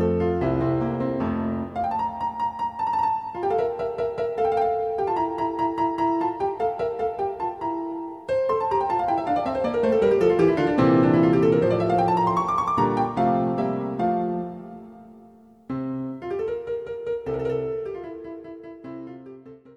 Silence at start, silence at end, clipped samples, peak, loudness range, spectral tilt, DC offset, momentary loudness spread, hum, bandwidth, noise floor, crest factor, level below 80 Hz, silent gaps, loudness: 0 s; 0.05 s; under 0.1%; -6 dBFS; 10 LU; -8.5 dB/octave; under 0.1%; 15 LU; none; 9.4 kHz; -50 dBFS; 16 dB; -50 dBFS; none; -24 LUFS